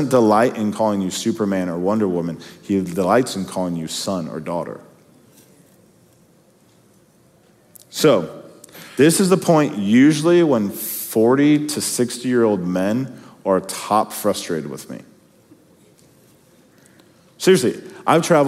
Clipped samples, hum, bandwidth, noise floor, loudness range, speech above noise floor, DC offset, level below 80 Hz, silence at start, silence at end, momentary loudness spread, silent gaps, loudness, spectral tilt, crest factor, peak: under 0.1%; none; 16 kHz; -54 dBFS; 12 LU; 36 dB; under 0.1%; -66 dBFS; 0 s; 0 s; 14 LU; none; -18 LUFS; -5 dB/octave; 20 dB; 0 dBFS